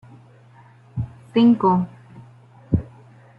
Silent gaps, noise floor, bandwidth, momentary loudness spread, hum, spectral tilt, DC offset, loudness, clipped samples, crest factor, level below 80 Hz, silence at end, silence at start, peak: none; -49 dBFS; 5 kHz; 17 LU; none; -10 dB/octave; under 0.1%; -21 LUFS; under 0.1%; 16 dB; -46 dBFS; 0.55 s; 0.95 s; -6 dBFS